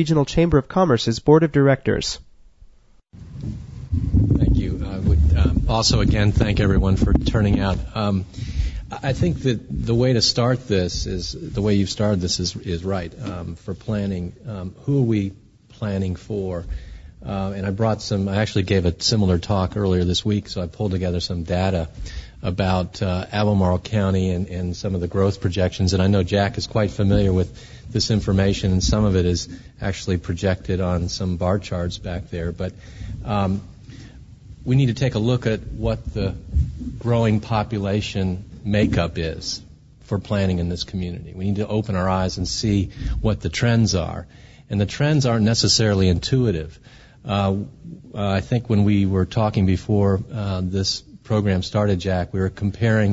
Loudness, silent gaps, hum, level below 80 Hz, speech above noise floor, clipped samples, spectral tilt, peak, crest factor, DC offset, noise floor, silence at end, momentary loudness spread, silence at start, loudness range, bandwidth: -21 LUFS; none; none; -32 dBFS; 29 dB; under 0.1%; -6 dB/octave; -2 dBFS; 20 dB; under 0.1%; -50 dBFS; 0 s; 12 LU; 0 s; 5 LU; 8 kHz